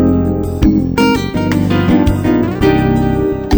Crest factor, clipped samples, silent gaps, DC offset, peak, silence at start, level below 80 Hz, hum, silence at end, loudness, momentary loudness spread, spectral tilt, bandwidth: 12 dB; under 0.1%; none; under 0.1%; 0 dBFS; 0 s; -24 dBFS; none; 0 s; -13 LUFS; 3 LU; -7.5 dB/octave; over 20 kHz